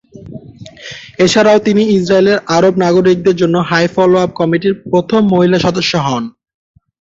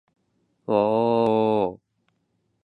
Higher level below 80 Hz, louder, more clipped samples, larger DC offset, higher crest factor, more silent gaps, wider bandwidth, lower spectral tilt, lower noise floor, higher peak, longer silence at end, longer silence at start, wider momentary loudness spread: first, -48 dBFS vs -64 dBFS; first, -11 LUFS vs -22 LUFS; neither; neither; second, 12 dB vs 18 dB; neither; first, 8 kHz vs 4.8 kHz; second, -5.5 dB/octave vs -8.5 dB/octave; second, -33 dBFS vs -72 dBFS; first, 0 dBFS vs -8 dBFS; second, 0.7 s vs 0.9 s; second, 0.15 s vs 0.7 s; first, 19 LU vs 8 LU